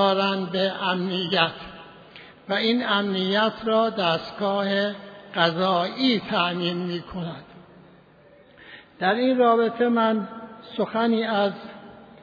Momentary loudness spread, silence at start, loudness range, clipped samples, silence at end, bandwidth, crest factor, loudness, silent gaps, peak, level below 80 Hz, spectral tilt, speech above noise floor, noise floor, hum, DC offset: 18 LU; 0 s; 3 LU; under 0.1%; 0.15 s; 5 kHz; 20 dB; -23 LUFS; none; -4 dBFS; -62 dBFS; -7 dB/octave; 30 dB; -53 dBFS; none; under 0.1%